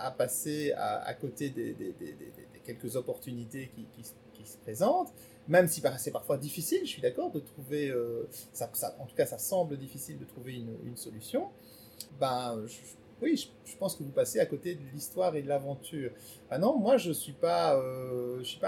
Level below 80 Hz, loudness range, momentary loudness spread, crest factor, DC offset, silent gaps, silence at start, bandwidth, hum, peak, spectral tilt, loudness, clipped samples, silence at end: -72 dBFS; 7 LU; 18 LU; 24 dB; under 0.1%; none; 0 s; 19 kHz; none; -10 dBFS; -4.5 dB/octave; -33 LUFS; under 0.1%; 0 s